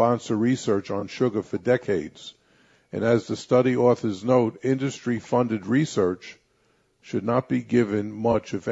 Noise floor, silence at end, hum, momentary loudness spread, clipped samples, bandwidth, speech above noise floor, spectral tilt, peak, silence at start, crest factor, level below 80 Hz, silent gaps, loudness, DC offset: -65 dBFS; 0 s; none; 9 LU; under 0.1%; 8 kHz; 42 dB; -7 dB/octave; -6 dBFS; 0 s; 18 dB; -60 dBFS; none; -24 LUFS; under 0.1%